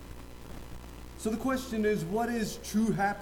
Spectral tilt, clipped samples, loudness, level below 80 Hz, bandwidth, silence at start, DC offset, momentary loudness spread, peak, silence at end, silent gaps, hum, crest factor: -5.5 dB/octave; under 0.1%; -31 LUFS; -48 dBFS; 18.5 kHz; 0 s; under 0.1%; 18 LU; -18 dBFS; 0 s; none; 60 Hz at -50 dBFS; 14 dB